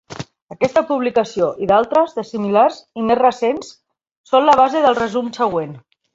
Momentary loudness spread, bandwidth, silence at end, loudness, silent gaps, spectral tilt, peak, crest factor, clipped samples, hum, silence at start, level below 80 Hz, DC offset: 11 LU; 7.8 kHz; 0.35 s; -17 LUFS; 0.42-0.47 s, 4.11-4.24 s; -5.5 dB/octave; -2 dBFS; 16 dB; under 0.1%; none; 0.1 s; -56 dBFS; under 0.1%